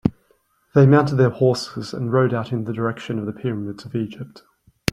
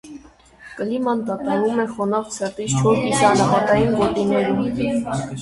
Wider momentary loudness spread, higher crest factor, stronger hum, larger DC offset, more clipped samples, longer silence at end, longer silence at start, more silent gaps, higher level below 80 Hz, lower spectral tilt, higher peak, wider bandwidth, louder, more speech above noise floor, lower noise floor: first, 15 LU vs 10 LU; about the same, 20 dB vs 18 dB; neither; neither; neither; first, 0.65 s vs 0 s; about the same, 0.05 s vs 0.05 s; neither; second, -54 dBFS vs -48 dBFS; first, -7.5 dB/octave vs -5.5 dB/octave; about the same, 0 dBFS vs -2 dBFS; about the same, 12.5 kHz vs 11.5 kHz; about the same, -21 LUFS vs -20 LUFS; first, 43 dB vs 27 dB; first, -62 dBFS vs -46 dBFS